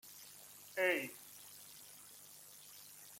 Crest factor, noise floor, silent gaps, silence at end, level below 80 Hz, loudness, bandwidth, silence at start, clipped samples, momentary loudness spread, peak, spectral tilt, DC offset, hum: 24 dB; -58 dBFS; none; 0 s; -88 dBFS; -40 LUFS; 16.5 kHz; 0.05 s; under 0.1%; 19 LU; -22 dBFS; -2 dB/octave; under 0.1%; 50 Hz at -75 dBFS